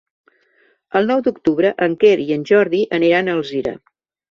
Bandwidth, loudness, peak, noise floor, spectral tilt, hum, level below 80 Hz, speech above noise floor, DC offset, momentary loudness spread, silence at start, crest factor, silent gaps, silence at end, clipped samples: 7 kHz; -17 LUFS; -2 dBFS; -59 dBFS; -6.5 dB/octave; none; -58 dBFS; 43 dB; under 0.1%; 9 LU; 0.95 s; 16 dB; none; 0.55 s; under 0.1%